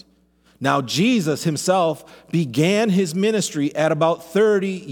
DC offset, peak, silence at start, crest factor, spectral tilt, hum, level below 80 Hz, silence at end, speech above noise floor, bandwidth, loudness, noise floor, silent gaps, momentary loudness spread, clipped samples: under 0.1%; -2 dBFS; 0.6 s; 18 dB; -5 dB/octave; none; -66 dBFS; 0 s; 39 dB; 18.5 kHz; -20 LUFS; -58 dBFS; none; 5 LU; under 0.1%